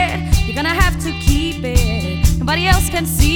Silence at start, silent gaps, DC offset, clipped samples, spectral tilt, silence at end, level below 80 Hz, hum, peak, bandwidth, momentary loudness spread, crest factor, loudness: 0 s; none; under 0.1%; under 0.1%; -4.5 dB/octave; 0 s; -18 dBFS; none; 0 dBFS; over 20 kHz; 4 LU; 14 dB; -17 LUFS